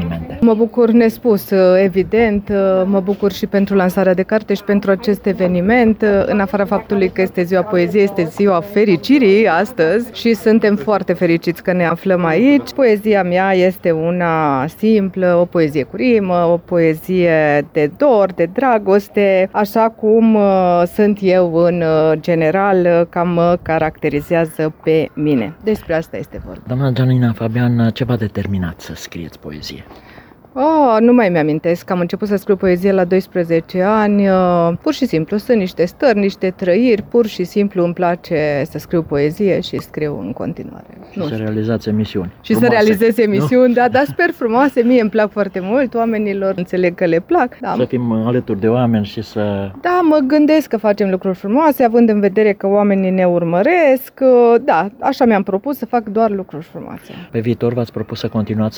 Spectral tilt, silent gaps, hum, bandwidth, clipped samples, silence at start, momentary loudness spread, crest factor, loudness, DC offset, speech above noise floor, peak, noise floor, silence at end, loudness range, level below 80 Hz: -7.5 dB/octave; none; none; over 20 kHz; under 0.1%; 0 s; 8 LU; 12 dB; -14 LUFS; under 0.1%; 27 dB; -2 dBFS; -41 dBFS; 0 s; 5 LU; -46 dBFS